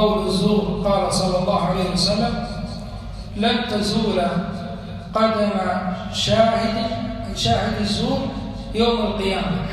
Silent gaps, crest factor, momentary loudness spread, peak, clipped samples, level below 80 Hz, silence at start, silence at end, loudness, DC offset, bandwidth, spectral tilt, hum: none; 18 dB; 11 LU; -2 dBFS; under 0.1%; -36 dBFS; 0 s; 0 s; -21 LUFS; under 0.1%; 13.5 kHz; -5.5 dB/octave; none